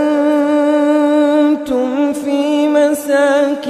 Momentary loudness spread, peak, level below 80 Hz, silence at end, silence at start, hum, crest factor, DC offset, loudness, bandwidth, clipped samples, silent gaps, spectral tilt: 4 LU; 0 dBFS; -56 dBFS; 0 s; 0 s; none; 12 dB; under 0.1%; -13 LUFS; 14 kHz; under 0.1%; none; -4 dB/octave